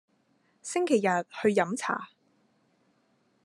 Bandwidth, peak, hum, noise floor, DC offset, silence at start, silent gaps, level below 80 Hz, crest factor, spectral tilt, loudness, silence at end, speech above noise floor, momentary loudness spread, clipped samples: 12.5 kHz; -10 dBFS; none; -70 dBFS; under 0.1%; 0.65 s; none; -78 dBFS; 20 dB; -4.5 dB/octave; -28 LUFS; 1.4 s; 42 dB; 13 LU; under 0.1%